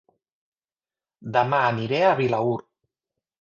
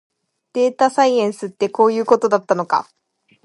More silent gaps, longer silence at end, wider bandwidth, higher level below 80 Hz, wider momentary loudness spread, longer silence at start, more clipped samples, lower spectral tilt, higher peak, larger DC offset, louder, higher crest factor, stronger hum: neither; first, 0.8 s vs 0.6 s; second, 7.2 kHz vs 11.5 kHz; first, -66 dBFS vs -72 dBFS; about the same, 9 LU vs 8 LU; first, 1.2 s vs 0.55 s; neither; first, -7 dB/octave vs -5 dB/octave; second, -6 dBFS vs 0 dBFS; neither; second, -22 LUFS vs -17 LUFS; about the same, 20 dB vs 18 dB; neither